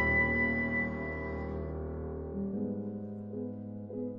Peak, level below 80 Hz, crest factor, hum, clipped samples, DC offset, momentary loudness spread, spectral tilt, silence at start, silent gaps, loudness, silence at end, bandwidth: -18 dBFS; -46 dBFS; 16 dB; none; under 0.1%; under 0.1%; 13 LU; -9.5 dB/octave; 0 s; none; -34 LUFS; 0 s; 5.8 kHz